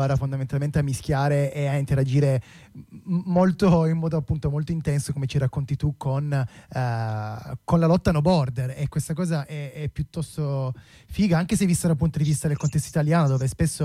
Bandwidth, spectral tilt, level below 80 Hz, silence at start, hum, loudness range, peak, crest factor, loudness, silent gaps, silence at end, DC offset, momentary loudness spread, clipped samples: 14.5 kHz; -7 dB/octave; -42 dBFS; 0 s; none; 3 LU; -10 dBFS; 14 dB; -24 LUFS; none; 0 s; under 0.1%; 10 LU; under 0.1%